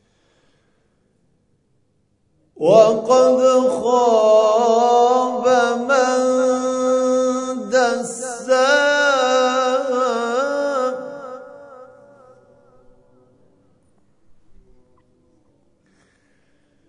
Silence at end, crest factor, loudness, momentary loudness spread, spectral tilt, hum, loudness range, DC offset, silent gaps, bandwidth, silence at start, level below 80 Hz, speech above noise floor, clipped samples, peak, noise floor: 5.05 s; 18 dB; -16 LUFS; 11 LU; -3.5 dB/octave; none; 9 LU; under 0.1%; none; 11 kHz; 2.6 s; -66 dBFS; 51 dB; under 0.1%; 0 dBFS; -64 dBFS